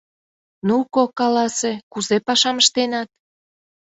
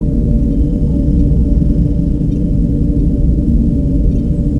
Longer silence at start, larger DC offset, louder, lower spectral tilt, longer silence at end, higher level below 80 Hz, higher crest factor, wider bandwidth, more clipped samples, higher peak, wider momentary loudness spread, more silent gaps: first, 0.65 s vs 0 s; second, under 0.1% vs 2%; second, -19 LUFS vs -14 LUFS; second, -2.5 dB/octave vs -11.5 dB/octave; first, 0.9 s vs 0 s; second, -66 dBFS vs -14 dBFS; first, 20 dB vs 12 dB; first, 8.4 kHz vs 3.1 kHz; neither; about the same, -2 dBFS vs 0 dBFS; first, 11 LU vs 2 LU; first, 1.83-1.91 s vs none